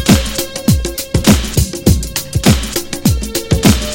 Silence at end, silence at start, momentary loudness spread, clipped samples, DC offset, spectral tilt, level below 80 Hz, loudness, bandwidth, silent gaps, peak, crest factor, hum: 0 s; 0 s; 6 LU; 0.2%; under 0.1%; -4.5 dB/octave; -22 dBFS; -14 LUFS; 17.5 kHz; none; 0 dBFS; 14 dB; none